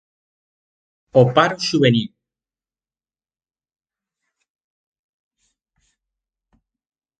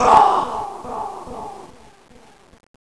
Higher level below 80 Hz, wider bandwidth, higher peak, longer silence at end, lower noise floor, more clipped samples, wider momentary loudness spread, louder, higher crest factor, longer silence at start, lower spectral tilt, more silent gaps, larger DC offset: second, -62 dBFS vs -48 dBFS; second, 9.2 kHz vs 11 kHz; about the same, 0 dBFS vs 0 dBFS; first, 5.1 s vs 1.2 s; first, under -90 dBFS vs -43 dBFS; neither; second, 7 LU vs 22 LU; about the same, -17 LUFS vs -19 LUFS; about the same, 24 dB vs 20 dB; first, 1.15 s vs 0 s; first, -6 dB/octave vs -4 dB/octave; neither; second, under 0.1% vs 0.5%